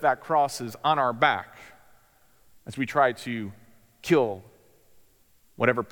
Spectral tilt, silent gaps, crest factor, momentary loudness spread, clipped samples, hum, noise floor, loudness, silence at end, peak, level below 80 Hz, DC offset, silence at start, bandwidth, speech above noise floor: -5 dB/octave; none; 22 dB; 17 LU; under 0.1%; none; -61 dBFS; -25 LUFS; 0.05 s; -6 dBFS; -68 dBFS; under 0.1%; 0 s; 19 kHz; 36 dB